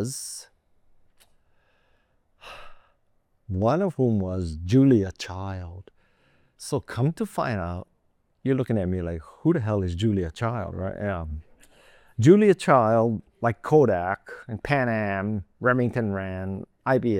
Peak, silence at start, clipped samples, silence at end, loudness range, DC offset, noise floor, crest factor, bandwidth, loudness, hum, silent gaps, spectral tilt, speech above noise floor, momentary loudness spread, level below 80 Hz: -4 dBFS; 0 s; under 0.1%; 0 s; 9 LU; under 0.1%; -68 dBFS; 22 dB; 16 kHz; -24 LUFS; none; none; -7 dB/octave; 45 dB; 17 LU; -52 dBFS